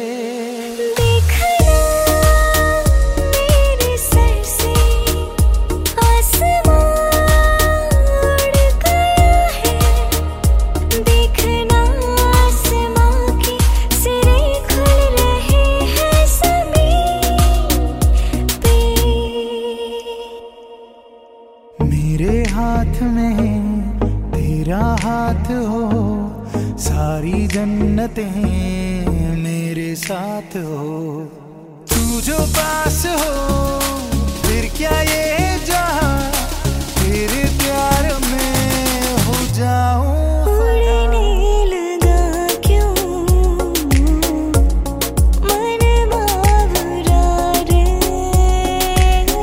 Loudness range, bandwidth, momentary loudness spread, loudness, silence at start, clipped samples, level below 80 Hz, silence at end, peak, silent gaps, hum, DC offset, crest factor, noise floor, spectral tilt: 6 LU; 16.5 kHz; 7 LU; -16 LUFS; 0 s; under 0.1%; -18 dBFS; 0 s; 0 dBFS; none; none; under 0.1%; 14 dB; -42 dBFS; -5 dB/octave